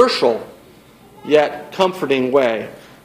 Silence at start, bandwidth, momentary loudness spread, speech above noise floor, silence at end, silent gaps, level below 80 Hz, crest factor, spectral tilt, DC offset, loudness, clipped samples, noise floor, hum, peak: 0 s; 15.5 kHz; 17 LU; 28 dB; 0.25 s; none; -60 dBFS; 18 dB; -4.5 dB/octave; under 0.1%; -17 LUFS; under 0.1%; -45 dBFS; none; 0 dBFS